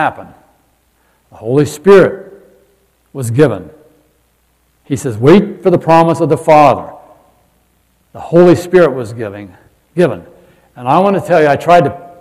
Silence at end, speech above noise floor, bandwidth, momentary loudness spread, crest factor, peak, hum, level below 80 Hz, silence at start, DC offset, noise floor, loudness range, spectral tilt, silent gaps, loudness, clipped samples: 0.15 s; 46 dB; 14.5 kHz; 17 LU; 12 dB; 0 dBFS; none; -48 dBFS; 0 s; under 0.1%; -56 dBFS; 4 LU; -7 dB/octave; none; -10 LUFS; 2%